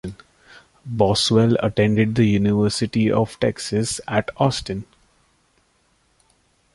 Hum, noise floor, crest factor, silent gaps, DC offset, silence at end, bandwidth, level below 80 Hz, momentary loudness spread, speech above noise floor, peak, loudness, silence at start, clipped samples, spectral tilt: none; -63 dBFS; 18 dB; none; under 0.1%; 1.9 s; 11.5 kHz; -46 dBFS; 13 LU; 44 dB; -2 dBFS; -20 LUFS; 0.05 s; under 0.1%; -5.5 dB/octave